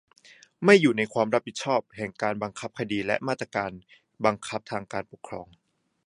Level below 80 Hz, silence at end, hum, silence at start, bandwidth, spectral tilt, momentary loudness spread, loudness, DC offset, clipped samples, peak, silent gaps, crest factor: -64 dBFS; 0.65 s; none; 0.6 s; 11 kHz; -5 dB/octave; 17 LU; -26 LUFS; under 0.1%; under 0.1%; -2 dBFS; none; 24 dB